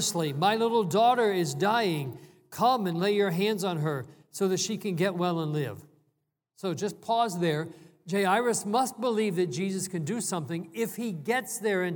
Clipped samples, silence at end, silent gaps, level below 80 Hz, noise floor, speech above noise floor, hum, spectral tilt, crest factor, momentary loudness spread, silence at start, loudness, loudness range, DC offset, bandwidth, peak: under 0.1%; 0 s; none; -78 dBFS; -77 dBFS; 49 dB; none; -4.5 dB/octave; 16 dB; 10 LU; 0 s; -28 LUFS; 5 LU; under 0.1%; 19.5 kHz; -12 dBFS